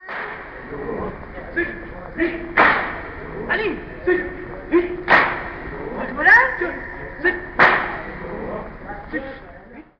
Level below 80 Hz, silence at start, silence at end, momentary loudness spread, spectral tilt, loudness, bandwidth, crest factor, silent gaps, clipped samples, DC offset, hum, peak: -40 dBFS; 0 s; 0.15 s; 18 LU; -6.5 dB/octave; -19 LUFS; 6.8 kHz; 20 dB; none; under 0.1%; under 0.1%; none; 0 dBFS